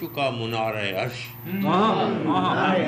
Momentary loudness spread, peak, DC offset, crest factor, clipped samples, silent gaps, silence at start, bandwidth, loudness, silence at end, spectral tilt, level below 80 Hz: 9 LU; -10 dBFS; under 0.1%; 12 dB; under 0.1%; none; 0 s; 15 kHz; -24 LUFS; 0 s; -6.5 dB/octave; -62 dBFS